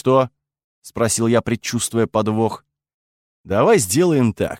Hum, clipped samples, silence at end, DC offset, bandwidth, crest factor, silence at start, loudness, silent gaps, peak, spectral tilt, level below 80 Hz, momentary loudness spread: none; under 0.1%; 0 s; under 0.1%; 16.5 kHz; 16 dB; 0.05 s; -18 LUFS; 0.64-0.82 s, 2.94-3.44 s; -2 dBFS; -5 dB/octave; -52 dBFS; 9 LU